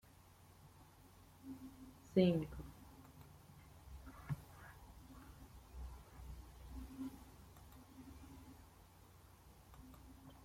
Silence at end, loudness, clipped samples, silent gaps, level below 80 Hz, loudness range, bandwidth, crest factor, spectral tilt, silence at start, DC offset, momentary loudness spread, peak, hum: 0 s; -44 LUFS; under 0.1%; none; -60 dBFS; 14 LU; 16.5 kHz; 28 dB; -7.5 dB/octave; 0.05 s; under 0.1%; 22 LU; -20 dBFS; none